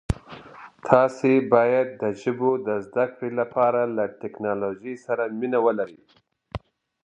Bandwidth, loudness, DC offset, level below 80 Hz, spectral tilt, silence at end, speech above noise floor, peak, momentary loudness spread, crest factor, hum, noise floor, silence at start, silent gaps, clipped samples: 11 kHz; -23 LUFS; under 0.1%; -46 dBFS; -7.5 dB/octave; 0.45 s; 22 dB; 0 dBFS; 18 LU; 24 dB; none; -44 dBFS; 0.1 s; none; under 0.1%